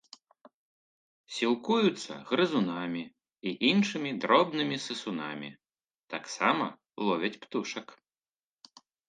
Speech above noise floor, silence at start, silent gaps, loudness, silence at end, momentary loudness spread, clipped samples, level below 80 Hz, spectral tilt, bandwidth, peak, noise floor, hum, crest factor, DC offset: over 60 dB; 1.3 s; 5.95-6.08 s; -30 LUFS; 1.15 s; 15 LU; under 0.1%; -80 dBFS; -4.5 dB/octave; 9.6 kHz; -8 dBFS; under -90 dBFS; none; 24 dB; under 0.1%